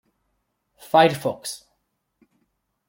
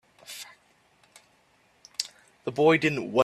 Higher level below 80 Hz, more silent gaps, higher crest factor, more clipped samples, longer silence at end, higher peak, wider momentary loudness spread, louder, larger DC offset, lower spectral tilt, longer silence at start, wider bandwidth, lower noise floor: about the same, -70 dBFS vs -68 dBFS; neither; about the same, 24 dB vs 22 dB; neither; first, 1.3 s vs 0 s; first, -2 dBFS vs -8 dBFS; second, 17 LU vs 21 LU; first, -20 LUFS vs -26 LUFS; neither; about the same, -4.5 dB/octave vs -4.5 dB/octave; first, 0.95 s vs 0.3 s; first, 16.5 kHz vs 14.5 kHz; first, -74 dBFS vs -64 dBFS